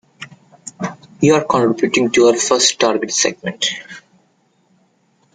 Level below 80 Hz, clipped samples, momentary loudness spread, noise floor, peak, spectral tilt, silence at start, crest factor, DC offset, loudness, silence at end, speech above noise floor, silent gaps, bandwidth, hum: -58 dBFS; under 0.1%; 23 LU; -59 dBFS; 0 dBFS; -3 dB/octave; 0.2 s; 18 dB; under 0.1%; -15 LUFS; 1.35 s; 44 dB; none; 9.6 kHz; none